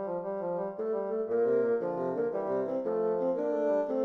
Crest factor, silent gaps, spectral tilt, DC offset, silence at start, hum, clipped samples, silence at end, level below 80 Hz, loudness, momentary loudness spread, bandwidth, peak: 12 dB; none; -9.5 dB/octave; under 0.1%; 0 s; none; under 0.1%; 0 s; -74 dBFS; -31 LUFS; 6 LU; 4.3 kHz; -18 dBFS